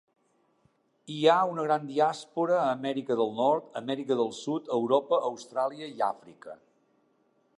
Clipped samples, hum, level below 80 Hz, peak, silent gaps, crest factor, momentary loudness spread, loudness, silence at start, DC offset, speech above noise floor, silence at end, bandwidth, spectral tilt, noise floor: under 0.1%; none; -84 dBFS; -8 dBFS; none; 20 dB; 9 LU; -28 LUFS; 1.1 s; under 0.1%; 41 dB; 1.05 s; 11 kHz; -5.5 dB/octave; -69 dBFS